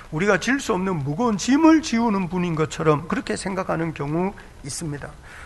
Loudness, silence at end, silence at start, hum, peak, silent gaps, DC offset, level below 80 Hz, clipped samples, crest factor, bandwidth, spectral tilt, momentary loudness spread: -22 LUFS; 0 s; 0 s; none; -4 dBFS; none; under 0.1%; -46 dBFS; under 0.1%; 18 dB; 12 kHz; -5.5 dB/octave; 14 LU